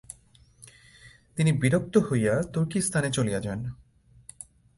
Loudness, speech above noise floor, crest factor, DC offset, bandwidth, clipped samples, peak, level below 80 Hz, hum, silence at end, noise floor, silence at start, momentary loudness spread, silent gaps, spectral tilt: -26 LUFS; 33 dB; 20 dB; under 0.1%; 11.5 kHz; under 0.1%; -8 dBFS; -54 dBFS; none; 1.05 s; -58 dBFS; 0.1 s; 22 LU; none; -6 dB/octave